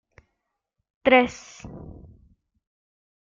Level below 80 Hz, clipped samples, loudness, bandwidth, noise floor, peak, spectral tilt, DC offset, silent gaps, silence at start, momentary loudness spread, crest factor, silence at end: -56 dBFS; under 0.1%; -20 LUFS; 7.6 kHz; -80 dBFS; -4 dBFS; -4.5 dB/octave; under 0.1%; none; 1.05 s; 24 LU; 24 dB; 1.55 s